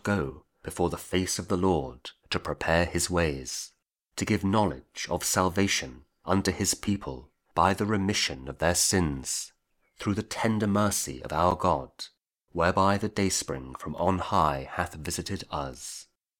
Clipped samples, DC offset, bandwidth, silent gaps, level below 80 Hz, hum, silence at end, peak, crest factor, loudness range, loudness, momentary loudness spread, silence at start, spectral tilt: under 0.1%; under 0.1%; 19.5 kHz; none; -48 dBFS; none; 0.35 s; -6 dBFS; 22 dB; 2 LU; -28 LUFS; 15 LU; 0.05 s; -4 dB/octave